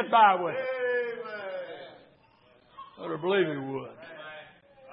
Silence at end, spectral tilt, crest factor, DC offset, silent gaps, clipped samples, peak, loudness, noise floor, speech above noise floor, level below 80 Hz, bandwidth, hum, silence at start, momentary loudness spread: 0 s; -9 dB/octave; 22 dB; under 0.1%; none; under 0.1%; -8 dBFS; -28 LUFS; -61 dBFS; 35 dB; -80 dBFS; 5.4 kHz; none; 0 s; 24 LU